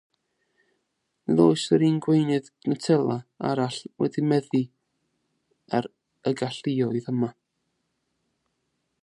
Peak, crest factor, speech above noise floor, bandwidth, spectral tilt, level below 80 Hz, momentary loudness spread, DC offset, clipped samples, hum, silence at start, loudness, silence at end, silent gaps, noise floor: -6 dBFS; 22 dB; 53 dB; 11 kHz; -7 dB/octave; -72 dBFS; 10 LU; under 0.1%; under 0.1%; none; 1.3 s; -25 LUFS; 1.7 s; none; -77 dBFS